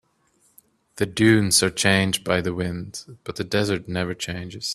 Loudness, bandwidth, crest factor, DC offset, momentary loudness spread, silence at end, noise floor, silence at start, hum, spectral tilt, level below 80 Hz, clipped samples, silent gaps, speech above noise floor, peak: -22 LUFS; 15 kHz; 22 dB; under 0.1%; 15 LU; 0 s; -64 dBFS; 0.95 s; none; -4 dB/octave; -54 dBFS; under 0.1%; none; 41 dB; -2 dBFS